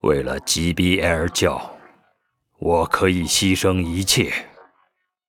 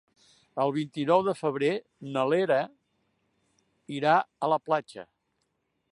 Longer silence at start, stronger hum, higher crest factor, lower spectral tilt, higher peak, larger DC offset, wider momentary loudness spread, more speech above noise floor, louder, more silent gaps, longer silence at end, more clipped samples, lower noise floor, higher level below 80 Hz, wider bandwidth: second, 0.05 s vs 0.55 s; neither; about the same, 20 dB vs 20 dB; second, -4 dB/octave vs -6.5 dB/octave; first, -2 dBFS vs -8 dBFS; neither; second, 7 LU vs 15 LU; about the same, 49 dB vs 50 dB; first, -19 LUFS vs -27 LUFS; neither; about the same, 0.8 s vs 0.9 s; neither; second, -68 dBFS vs -77 dBFS; first, -40 dBFS vs -78 dBFS; first, 19.5 kHz vs 11 kHz